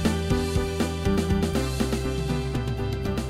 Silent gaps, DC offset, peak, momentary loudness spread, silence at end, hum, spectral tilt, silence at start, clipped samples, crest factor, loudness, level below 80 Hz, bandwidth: none; under 0.1%; -10 dBFS; 4 LU; 0 s; none; -6 dB/octave; 0 s; under 0.1%; 16 dB; -26 LUFS; -32 dBFS; 16 kHz